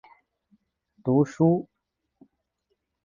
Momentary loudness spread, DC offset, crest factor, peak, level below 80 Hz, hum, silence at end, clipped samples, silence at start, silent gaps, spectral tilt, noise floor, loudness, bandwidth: 14 LU; under 0.1%; 18 dB; -10 dBFS; -64 dBFS; none; 1.4 s; under 0.1%; 1.05 s; none; -9.5 dB/octave; -77 dBFS; -24 LUFS; 7.4 kHz